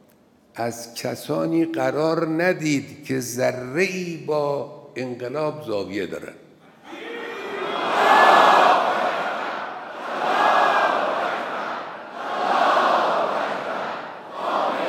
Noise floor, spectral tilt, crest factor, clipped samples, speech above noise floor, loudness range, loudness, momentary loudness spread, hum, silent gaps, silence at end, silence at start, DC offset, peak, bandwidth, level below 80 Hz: -56 dBFS; -4.5 dB/octave; 20 dB; under 0.1%; 31 dB; 9 LU; -21 LUFS; 16 LU; none; none; 0 s; 0.55 s; under 0.1%; -2 dBFS; 19 kHz; -74 dBFS